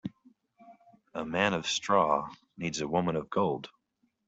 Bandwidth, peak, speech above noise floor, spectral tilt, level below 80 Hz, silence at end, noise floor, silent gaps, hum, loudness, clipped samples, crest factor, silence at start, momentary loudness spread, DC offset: 8.2 kHz; -10 dBFS; 47 dB; -4.5 dB/octave; -66 dBFS; 0.6 s; -76 dBFS; none; none; -30 LUFS; under 0.1%; 22 dB; 0.05 s; 17 LU; under 0.1%